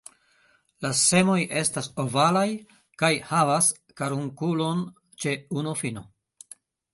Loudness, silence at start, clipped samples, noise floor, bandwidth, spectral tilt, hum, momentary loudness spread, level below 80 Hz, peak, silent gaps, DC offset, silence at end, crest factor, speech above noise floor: -24 LUFS; 0.8 s; under 0.1%; -64 dBFS; 12 kHz; -4 dB/octave; none; 12 LU; -64 dBFS; -8 dBFS; none; under 0.1%; 0.9 s; 18 dB; 39 dB